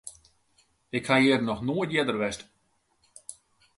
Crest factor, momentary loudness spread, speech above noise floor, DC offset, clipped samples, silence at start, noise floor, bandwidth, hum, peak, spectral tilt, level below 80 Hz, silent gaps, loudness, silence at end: 20 dB; 23 LU; 45 dB; under 0.1%; under 0.1%; 0.05 s; -71 dBFS; 11.5 kHz; none; -8 dBFS; -5 dB/octave; -62 dBFS; none; -26 LUFS; 0.45 s